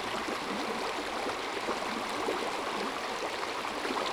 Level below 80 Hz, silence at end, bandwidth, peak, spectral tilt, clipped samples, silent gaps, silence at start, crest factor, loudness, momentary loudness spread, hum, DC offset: -62 dBFS; 0 s; over 20 kHz; -20 dBFS; -2.5 dB/octave; under 0.1%; none; 0 s; 14 dB; -33 LUFS; 2 LU; none; under 0.1%